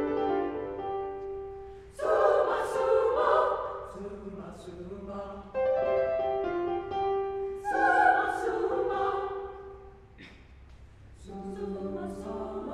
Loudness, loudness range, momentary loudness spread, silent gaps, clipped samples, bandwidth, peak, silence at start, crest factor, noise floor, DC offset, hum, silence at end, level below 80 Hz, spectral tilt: -29 LUFS; 8 LU; 18 LU; none; under 0.1%; 12.5 kHz; -10 dBFS; 0 s; 20 dB; -51 dBFS; under 0.1%; none; 0 s; -54 dBFS; -6 dB/octave